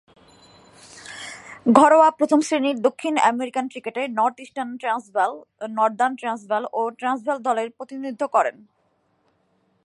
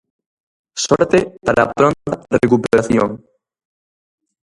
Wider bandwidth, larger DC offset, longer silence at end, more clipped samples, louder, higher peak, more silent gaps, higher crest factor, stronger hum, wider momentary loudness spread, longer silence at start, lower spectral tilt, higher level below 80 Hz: about the same, 11.5 kHz vs 11.5 kHz; neither; about the same, 1.35 s vs 1.35 s; neither; second, -21 LUFS vs -16 LUFS; about the same, 0 dBFS vs 0 dBFS; neither; about the same, 22 dB vs 18 dB; neither; first, 17 LU vs 10 LU; first, 0.95 s vs 0.75 s; about the same, -4 dB/octave vs -5 dB/octave; second, -70 dBFS vs -46 dBFS